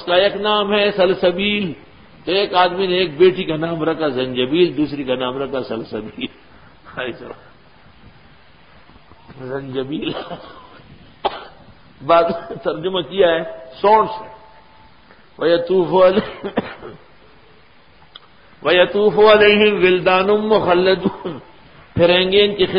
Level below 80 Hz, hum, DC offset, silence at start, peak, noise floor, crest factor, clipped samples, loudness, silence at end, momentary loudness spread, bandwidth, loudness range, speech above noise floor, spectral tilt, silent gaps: -50 dBFS; none; 0.3%; 0 s; 0 dBFS; -50 dBFS; 18 dB; under 0.1%; -16 LUFS; 0 s; 17 LU; 5.2 kHz; 16 LU; 33 dB; -10.5 dB/octave; none